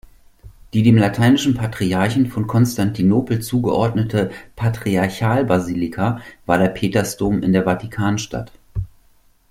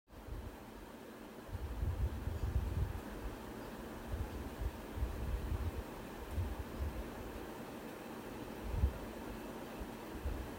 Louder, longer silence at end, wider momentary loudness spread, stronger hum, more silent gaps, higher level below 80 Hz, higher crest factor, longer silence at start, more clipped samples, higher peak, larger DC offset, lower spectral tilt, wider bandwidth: first, -18 LUFS vs -44 LUFS; first, 0.65 s vs 0 s; about the same, 10 LU vs 9 LU; neither; neither; about the same, -42 dBFS vs -44 dBFS; about the same, 16 dB vs 20 dB; first, 0.45 s vs 0.1 s; neither; first, -2 dBFS vs -22 dBFS; neither; about the same, -6.5 dB/octave vs -6.5 dB/octave; about the same, 16 kHz vs 16 kHz